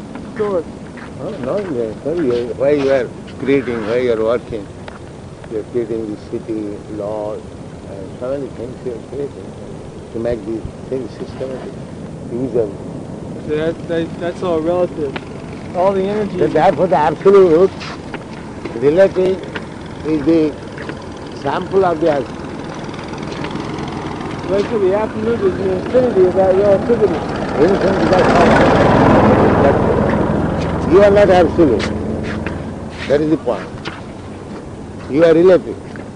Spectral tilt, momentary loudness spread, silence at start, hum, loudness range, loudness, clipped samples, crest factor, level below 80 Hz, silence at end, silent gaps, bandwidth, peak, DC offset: -7 dB/octave; 19 LU; 0 s; none; 13 LU; -16 LUFS; under 0.1%; 14 dB; -38 dBFS; 0 s; none; 10 kHz; -2 dBFS; under 0.1%